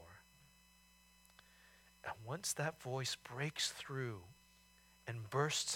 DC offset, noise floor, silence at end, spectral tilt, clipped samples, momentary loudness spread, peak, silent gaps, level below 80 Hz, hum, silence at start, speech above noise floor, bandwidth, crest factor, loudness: under 0.1%; -68 dBFS; 0 s; -3 dB/octave; under 0.1%; 19 LU; -22 dBFS; none; -76 dBFS; none; 0 s; 27 dB; 18 kHz; 22 dB; -42 LUFS